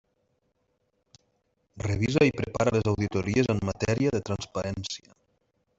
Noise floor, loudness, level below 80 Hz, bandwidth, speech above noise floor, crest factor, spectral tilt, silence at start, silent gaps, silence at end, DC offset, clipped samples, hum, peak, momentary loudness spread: -74 dBFS; -27 LUFS; -50 dBFS; 8 kHz; 48 dB; 20 dB; -6 dB/octave; 1.75 s; none; 0.8 s; under 0.1%; under 0.1%; none; -8 dBFS; 10 LU